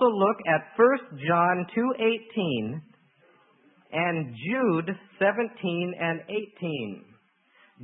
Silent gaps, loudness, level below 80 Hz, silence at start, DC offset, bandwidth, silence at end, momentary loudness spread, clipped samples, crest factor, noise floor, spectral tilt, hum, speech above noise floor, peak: none; -26 LUFS; -76 dBFS; 0 s; under 0.1%; 3.9 kHz; 0 s; 12 LU; under 0.1%; 20 dB; -62 dBFS; -10.5 dB/octave; none; 36 dB; -8 dBFS